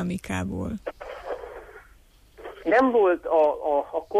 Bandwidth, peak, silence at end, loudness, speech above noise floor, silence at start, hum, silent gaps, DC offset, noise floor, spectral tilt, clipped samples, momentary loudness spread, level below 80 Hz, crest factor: 14.5 kHz; -10 dBFS; 0 s; -24 LUFS; 32 dB; 0 s; none; none; under 0.1%; -55 dBFS; -6.5 dB/octave; under 0.1%; 21 LU; -50 dBFS; 14 dB